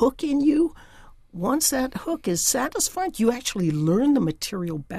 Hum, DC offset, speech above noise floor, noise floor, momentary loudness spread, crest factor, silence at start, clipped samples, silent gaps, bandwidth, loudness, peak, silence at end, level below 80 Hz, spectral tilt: none; under 0.1%; 25 dB; -48 dBFS; 8 LU; 16 dB; 0 s; under 0.1%; none; 15.5 kHz; -23 LUFS; -8 dBFS; 0 s; -48 dBFS; -4.5 dB/octave